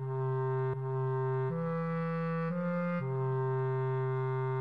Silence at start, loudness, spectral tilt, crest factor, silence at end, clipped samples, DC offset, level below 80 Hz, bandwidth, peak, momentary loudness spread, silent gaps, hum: 0 s; -33 LUFS; -11 dB/octave; 6 dB; 0 s; under 0.1%; 0.1%; -74 dBFS; 4.6 kHz; -26 dBFS; 2 LU; none; none